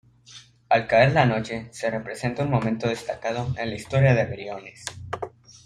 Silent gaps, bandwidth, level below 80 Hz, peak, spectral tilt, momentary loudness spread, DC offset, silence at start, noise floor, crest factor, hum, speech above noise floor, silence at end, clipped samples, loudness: none; 11.5 kHz; -54 dBFS; -4 dBFS; -6.5 dB/octave; 16 LU; under 0.1%; 0.3 s; -49 dBFS; 22 dB; none; 26 dB; 0.4 s; under 0.1%; -24 LUFS